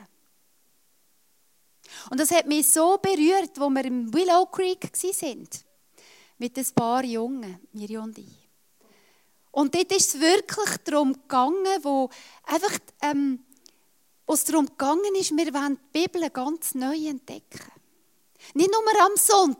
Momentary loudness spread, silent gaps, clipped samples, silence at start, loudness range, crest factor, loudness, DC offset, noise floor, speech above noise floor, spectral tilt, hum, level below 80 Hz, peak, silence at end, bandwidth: 17 LU; none; under 0.1%; 1.9 s; 8 LU; 22 dB; -23 LUFS; under 0.1%; -67 dBFS; 43 dB; -2.5 dB/octave; none; -74 dBFS; -4 dBFS; 0.05 s; 16.5 kHz